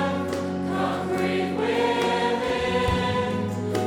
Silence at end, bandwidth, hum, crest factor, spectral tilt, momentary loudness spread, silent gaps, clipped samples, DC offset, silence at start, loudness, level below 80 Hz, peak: 0 s; 17 kHz; none; 14 dB; -5.5 dB/octave; 5 LU; none; under 0.1%; under 0.1%; 0 s; -25 LUFS; -44 dBFS; -10 dBFS